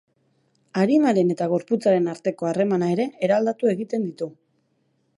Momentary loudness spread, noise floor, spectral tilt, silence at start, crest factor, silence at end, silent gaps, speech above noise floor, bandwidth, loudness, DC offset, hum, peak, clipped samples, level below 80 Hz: 9 LU; -68 dBFS; -7.5 dB/octave; 0.75 s; 16 dB; 0.85 s; none; 47 dB; 11.5 kHz; -22 LUFS; under 0.1%; none; -8 dBFS; under 0.1%; -74 dBFS